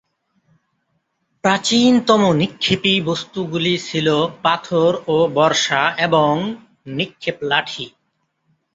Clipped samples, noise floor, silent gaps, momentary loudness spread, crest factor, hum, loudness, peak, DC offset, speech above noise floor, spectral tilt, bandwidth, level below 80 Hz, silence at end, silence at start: under 0.1%; -70 dBFS; none; 11 LU; 18 dB; none; -17 LUFS; -2 dBFS; under 0.1%; 52 dB; -4.5 dB/octave; 8.2 kHz; -56 dBFS; 0.85 s; 1.45 s